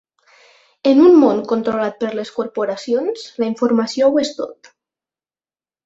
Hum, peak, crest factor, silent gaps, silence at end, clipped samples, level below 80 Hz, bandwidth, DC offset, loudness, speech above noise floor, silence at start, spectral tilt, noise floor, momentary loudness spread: none; -2 dBFS; 16 dB; none; 1.35 s; under 0.1%; -62 dBFS; 8 kHz; under 0.1%; -16 LUFS; over 74 dB; 0.85 s; -5.5 dB/octave; under -90 dBFS; 14 LU